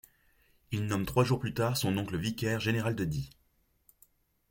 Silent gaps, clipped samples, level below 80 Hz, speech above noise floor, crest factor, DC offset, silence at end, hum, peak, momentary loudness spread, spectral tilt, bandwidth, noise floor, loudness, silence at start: none; under 0.1%; -56 dBFS; 37 dB; 20 dB; under 0.1%; 1.2 s; none; -12 dBFS; 8 LU; -5.5 dB/octave; 17 kHz; -68 dBFS; -32 LUFS; 0.7 s